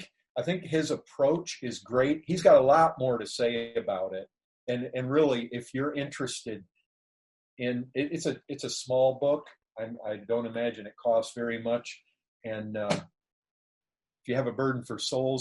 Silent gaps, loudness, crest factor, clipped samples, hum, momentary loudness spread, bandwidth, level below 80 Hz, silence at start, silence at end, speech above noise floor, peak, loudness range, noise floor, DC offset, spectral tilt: 0.29-0.35 s, 4.44-4.67 s, 6.86-7.57 s, 12.28-12.40 s, 13.32-13.42 s, 13.51-13.81 s; -29 LUFS; 22 dB; under 0.1%; none; 13 LU; 11.5 kHz; -68 dBFS; 0 s; 0 s; over 62 dB; -8 dBFS; 9 LU; under -90 dBFS; under 0.1%; -5 dB/octave